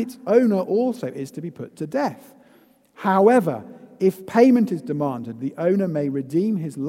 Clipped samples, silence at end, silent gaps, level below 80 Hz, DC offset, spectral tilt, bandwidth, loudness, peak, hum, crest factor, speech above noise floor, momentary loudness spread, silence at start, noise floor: under 0.1%; 0 s; none; -72 dBFS; under 0.1%; -8 dB/octave; 16 kHz; -21 LUFS; -2 dBFS; none; 18 dB; 34 dB; 15 LU; 0 s; -55 dBFS